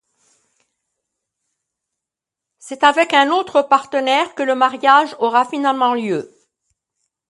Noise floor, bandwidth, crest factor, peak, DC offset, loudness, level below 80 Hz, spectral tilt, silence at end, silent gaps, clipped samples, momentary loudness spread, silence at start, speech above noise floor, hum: -85 dBFS; 11.5 kHz; 18 dB; 0 dBFS; under 0.1%; -16 LUFS; -72 dBFS; -3.5 dB/octave; 1.05 s; none; under 0.1%; 7 LU; 2.65 s; 69 dB; none